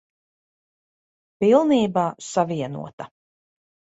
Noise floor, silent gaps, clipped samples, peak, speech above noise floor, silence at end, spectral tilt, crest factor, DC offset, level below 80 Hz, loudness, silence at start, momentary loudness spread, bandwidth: under -90 dBFS; 2.93-2.98 s; under 0.1%; -4 dBFS; over 69 dB; 0.9 s; -6 dB/octave; 20 dB; under 0.1%; -66 dBFS; -21 LUFS; 1.4 s; 20 LU; 8.2 kHz